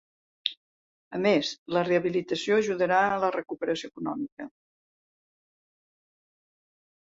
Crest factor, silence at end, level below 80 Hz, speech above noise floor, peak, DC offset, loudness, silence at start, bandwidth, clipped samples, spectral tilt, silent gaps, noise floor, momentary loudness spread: 24 dB; 2.55 s; -70 dBFS; over 63 dB; -6 dBFS; under 0.1%; -27 LUFS; 0.45 s; 7.8 kHz; under 0.1%; -5 dB/octave; 0.57-1.11 s, 1.58-1.66 s, 4.32-4.37 s; under -90 dBFS; 12 LU